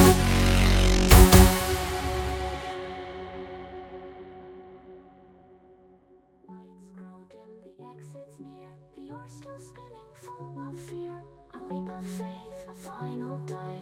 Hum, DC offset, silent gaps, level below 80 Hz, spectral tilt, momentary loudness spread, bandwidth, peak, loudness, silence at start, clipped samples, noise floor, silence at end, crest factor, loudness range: none; under 0.1%; none; -30 dBFS; -5 dB/octave; 29 LU; 17.5 kHz; -2 dBFS; -22 LUFS; 0 s; under 0.1%; -59 dBFS; 0 s; 24 dB; 28 LU